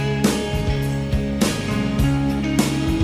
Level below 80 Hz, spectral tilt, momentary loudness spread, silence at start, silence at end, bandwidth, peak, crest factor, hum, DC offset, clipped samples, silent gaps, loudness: -30 dBFS; -5.5 dB/octave; 3 LU; 0 s; 0 s; 19.5 kHz; -4 dBFS; 16 dB; none; under 0.1%; under 0.1%; none; -21 LUFS